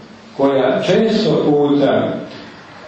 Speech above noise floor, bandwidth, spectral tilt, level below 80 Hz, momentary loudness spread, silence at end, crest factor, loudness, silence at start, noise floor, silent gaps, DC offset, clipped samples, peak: 22 dB; 8.4 kHz; -6.5 dB/octave; -54 dBFS; 19 LU; 0 s; 14 dB; -15 LUFS; 0 s; -36 dBFS; none; under 0.1%; under 0.1%; -2 dBFS